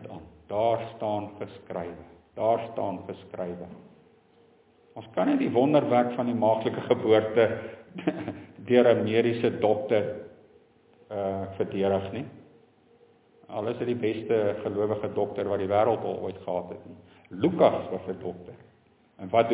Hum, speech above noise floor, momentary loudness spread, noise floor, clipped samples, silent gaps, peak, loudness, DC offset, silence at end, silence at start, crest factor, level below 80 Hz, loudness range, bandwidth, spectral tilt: none; 35 dB; 19 LU; -61 dBFS; under 0.1%; none; -6 dBFS; -27 LUFS; under 0.1%; 0 s; 0 s; 20 dB; -60 dBFS; 8 LU; 4 kHz; -10.5 dB/octave